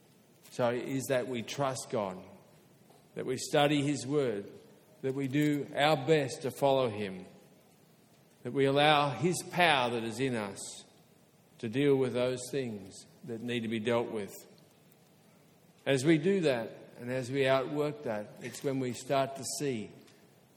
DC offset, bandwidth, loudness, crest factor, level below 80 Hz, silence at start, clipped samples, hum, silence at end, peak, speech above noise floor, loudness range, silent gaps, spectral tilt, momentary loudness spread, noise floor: under 0.1%; 17.5 kHz; -31 LUFS; 24 dB; -74 dBFS; 0.5 s; under 0.1%; none; 0.55 s; -8 dBFS; 32 dB; 5 LU; none; -5 dB/octave; 17 LU; -63 dBFS